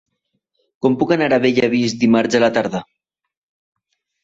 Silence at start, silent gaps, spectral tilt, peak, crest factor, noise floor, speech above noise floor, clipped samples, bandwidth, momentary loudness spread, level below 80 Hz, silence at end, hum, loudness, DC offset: 0.85 s; none; -5.5 dB/octave; -2 dBFS; 16 dB; -72 dBFS; 56 dB; under 0.1%; 7.8 kHz; 7 LU; -58 dBFS; 1.4 s; none; -16 LUFS; under 0.1%